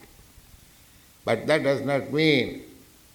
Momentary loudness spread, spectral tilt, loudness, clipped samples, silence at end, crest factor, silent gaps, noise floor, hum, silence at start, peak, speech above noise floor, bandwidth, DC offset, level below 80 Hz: 12 LU; -5.5 dB/octave; -24 LUFS; under 0.1%; 0.4 s; 22 dB; none; -54 dBFS; none; 1.25 s; -6 dBFS; 31 dB; 19.5 kHz; under 0.1%; -58 dBFS